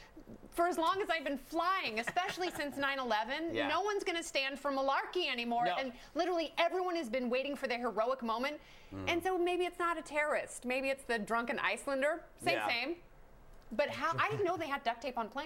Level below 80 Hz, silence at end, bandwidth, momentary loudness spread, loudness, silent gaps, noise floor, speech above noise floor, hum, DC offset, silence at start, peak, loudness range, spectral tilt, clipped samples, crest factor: -62 dBFS; 0 s; 16.5 kHz; 5 LU; -35 LUFS; none; -56 dBFS; 21 dB; none; under 0.1%; 0 s; -16 dBFS; 1 LU; -3.5 dB/octave; under 0.1%; 20 dB